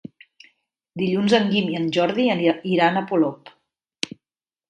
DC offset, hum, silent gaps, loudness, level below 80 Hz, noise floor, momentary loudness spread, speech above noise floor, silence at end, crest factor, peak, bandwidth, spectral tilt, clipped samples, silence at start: under 0.1%; none; none; -21 LUFS; -66 dBFS; under -90 dBFS; 12 LU; over 70 dB; 0.65 s; 20 dB; -2 dBFS; 11 kHz; -6 dB/octave; under 0.1%; 0.95 s